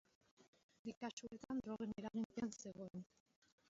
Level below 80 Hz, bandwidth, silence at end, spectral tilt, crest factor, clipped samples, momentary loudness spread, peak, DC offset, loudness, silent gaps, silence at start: -78 dBFS; 7.6 kHz; 0.65 s; -5.5 dB/octave; 16 dB; under 0.1%; 9 LU; -34 dBFS; under 0.1%; -49 LUFS; 0.48-0.53 s, 0.63-0.69 s, 0.79-0.85 s, 0.97-1.01 s, 1.13-1.17 s, 2.25-2.30 s; 0.4 s